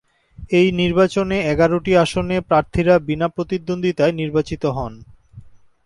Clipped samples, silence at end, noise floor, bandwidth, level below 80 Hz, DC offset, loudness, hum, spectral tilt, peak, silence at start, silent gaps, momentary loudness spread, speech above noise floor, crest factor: under 0.1%; 0.35 s; -42 dBFS; 11.5 kHz; -40 dBFS; under 0.1%; -18 LUFS; none; -6.5 dB/octave; -2 dBFS; 0.4 s; none; 7 LU; 25 dB; 16 dB